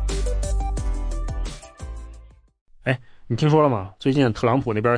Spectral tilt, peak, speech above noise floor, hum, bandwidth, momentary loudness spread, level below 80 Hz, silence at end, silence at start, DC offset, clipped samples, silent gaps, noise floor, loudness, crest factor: -6.5 dB/octave; -6 dBFS; 26 dB; none; 10.5 kHz; 19 LU; -30 dBFS; 0 s; 0 s; under 0.1%; under 0.1%; 2.61-2.66 s; -46 dBFS; -23 LUFS; 18 dB